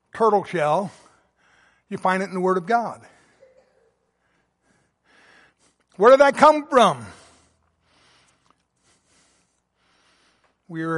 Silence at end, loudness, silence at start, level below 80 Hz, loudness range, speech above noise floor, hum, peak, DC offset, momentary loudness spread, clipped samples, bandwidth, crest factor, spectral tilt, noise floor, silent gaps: 0 s; -19 LUFS; 0.15 s; -66 dBFS; 10 LU; 50 dB; none; -2 dBFS; under 0.1%; 22 LU; under 0.1%; 11.5 kHz; 20 dB; -5 dB/octave; -68 dBFS; none